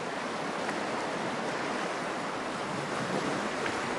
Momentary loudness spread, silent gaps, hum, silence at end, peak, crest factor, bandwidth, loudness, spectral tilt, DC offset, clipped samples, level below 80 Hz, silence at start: 3 LU; none; none; 0 s; -16 dBFS; 16 dB; 11.5 kHz; -33 LUFS; -4 dB/octave; under 0.1%; under 0.1%; -68 dBFS; 0 s